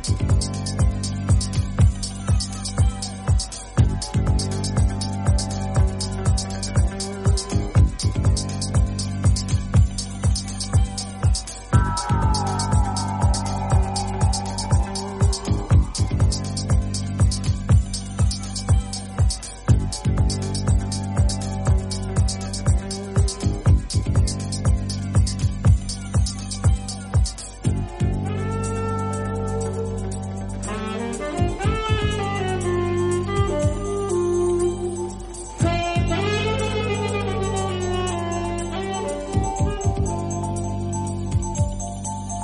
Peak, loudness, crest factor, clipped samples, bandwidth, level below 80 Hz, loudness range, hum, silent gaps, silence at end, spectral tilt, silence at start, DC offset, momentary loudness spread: -4 dBFS; -23 LUFS; 18 dB; under 0.1%; 11.5 kHz; -26 dBFS; 3 LU; none; none; 0 s; -5.5 dB/octave; 0 s; under 0.1%; 6 LU